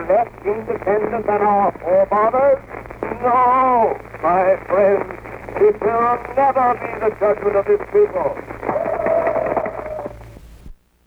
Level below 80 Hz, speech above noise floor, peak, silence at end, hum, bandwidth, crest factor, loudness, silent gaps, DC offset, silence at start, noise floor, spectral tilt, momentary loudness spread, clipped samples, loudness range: -44 dBFS; 24 dB; -4 dBFS; 0.35 s; none; 6 kHz; 14 dB; -18 LUFS; none; under 0.1%; 0 s; -40 dBFS; -8 dB/octave; 12 LU; under 0.1%; 3 LU